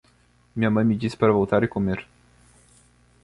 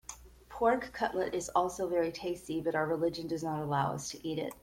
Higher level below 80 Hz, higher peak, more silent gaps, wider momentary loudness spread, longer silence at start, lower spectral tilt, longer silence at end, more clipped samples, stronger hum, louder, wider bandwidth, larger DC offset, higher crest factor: first, -50 dBFS vs -60 dBFS; first, -6 dBFS vs -14 dBFS; neither; about the same, 9 LU vs 8 LU; first, 0.55 s vs 0.1 s; first, -8 dB/octave vs -5 dB/octave; first, 1.2 s vs 0.05 s; neither; first, 60 Hz at -50 dBFS vs none; first, -22 LUFS vs -33 LUFS; second, 11.5 kHz vs 16.5 kHz; neither; about the same, 18 dB vs 20 dB